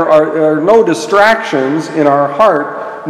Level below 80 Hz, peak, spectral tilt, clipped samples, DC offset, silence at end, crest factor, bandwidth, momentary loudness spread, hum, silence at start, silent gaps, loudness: -52 dBFS; 0 dBFS; -5.5 dB/octave; 0.9%; under 0.1%; 0 s; 10 dB; 13.5 kHz; 6 LU; none; 0 s; none; -10 LUFS